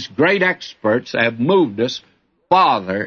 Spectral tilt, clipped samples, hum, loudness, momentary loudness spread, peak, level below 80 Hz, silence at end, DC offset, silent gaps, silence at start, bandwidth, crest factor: -5.5 dB/octave; under 0.1%; none; -17 LUFS; 8 LU; -2 dBFS; -62 dBFS; 0 s; under 0.1%; none; 0 s; 6.8 kHz; 14 dB